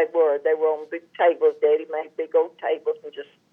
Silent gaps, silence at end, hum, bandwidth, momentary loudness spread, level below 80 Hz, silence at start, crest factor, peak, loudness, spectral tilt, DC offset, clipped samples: none; 0.3 s; none; 3.6 kHz; 13 LU; under -90 dBFS; 0 s; 14 dB; -8 dBFS; -23 LUFS; -5.5 dB/octave; under 0.1%; under 0.1%